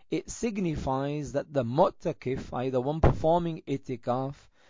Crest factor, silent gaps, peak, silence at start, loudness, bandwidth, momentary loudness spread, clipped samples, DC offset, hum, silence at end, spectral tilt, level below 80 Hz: 20 dB; none; -8 dBFS; 0.1 s; -29 LUFS; 7.6 kHz; 9 LU; under 0.1%; under 0.1%; none; 0.35 s; -7 dB/octave; -40 dBFS